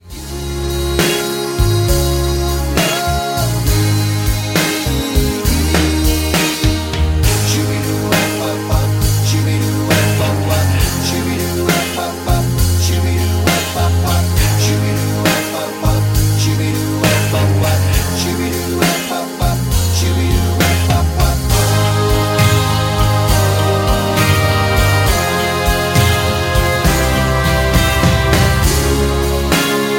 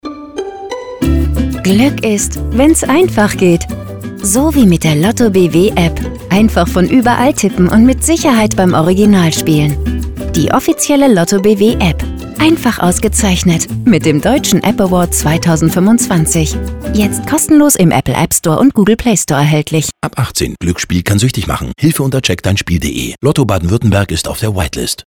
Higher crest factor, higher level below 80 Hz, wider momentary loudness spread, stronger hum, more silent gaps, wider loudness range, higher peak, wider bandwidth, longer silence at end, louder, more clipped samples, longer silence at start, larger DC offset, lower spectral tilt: about the same, 14 dB vs 10 dB; about the same, -22 dBFS vs -24 dBFS; second, 4 LU vs 8 LU; neither; neither; about the same, 2 LU vs 3 LU; about the same, 0 dBFS vs 0 dBFS; second, 17 kHz vs over 20 kHz; about the same, 0 s vs 0.05 s; second, -14 LUFS vs -11 LUFS; neither; about the same, 0.05 s vs 0.05 s; neither; about the same, -4.5 dB/octave vs -5 dB/octave